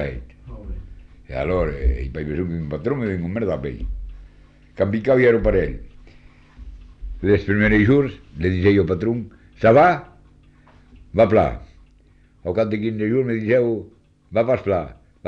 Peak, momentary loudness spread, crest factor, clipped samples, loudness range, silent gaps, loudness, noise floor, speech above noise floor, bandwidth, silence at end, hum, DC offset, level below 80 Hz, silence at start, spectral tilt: -4 dBFS; 21 LU; 16 dB; under 0.1%; 7 LU; none; -20 LUFS; -53 dBFS; 34 dB; 7.2 kHz; 0 s; none; under 0.1%; -34 dBFS; 0 s; -9 dB/octave